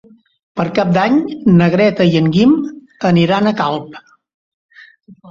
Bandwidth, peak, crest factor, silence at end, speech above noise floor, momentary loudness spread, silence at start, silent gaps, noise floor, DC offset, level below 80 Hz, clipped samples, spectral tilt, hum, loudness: 7.2 kHz; -2 dBFS; 14 dB; 0 s; 29 dB; 11 LU; 0.55 s; 4.34-4.69 s; -42 dBFS; under 0.1%; -50 dBFS; under 0.1%; -8 dB/octave; none; -13 LUFS